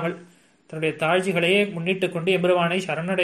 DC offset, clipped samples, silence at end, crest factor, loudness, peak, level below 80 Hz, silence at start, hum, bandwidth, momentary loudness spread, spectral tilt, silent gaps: under 0.1%; under 0.1%; 0 s; 16 dB; -22 LUFS; -6 dBFS; -68 dBFS; 0 s; none; 13.5 kHz; 9 LU; -5.5 dB/octave; none